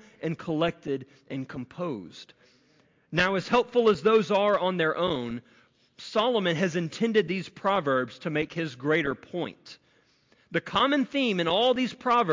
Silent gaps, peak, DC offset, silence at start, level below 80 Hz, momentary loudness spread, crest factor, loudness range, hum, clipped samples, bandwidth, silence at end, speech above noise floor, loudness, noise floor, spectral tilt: none; -12 dBFS; under 0.1%; 0.2 s; -62 dBFS; 14 LU; 16 dB; 5 LU; none; under 0.1%; 7.6 kHz; 0 s; 38 dB; -27 LUFS; -64 dBFS; -5.5 dB/octave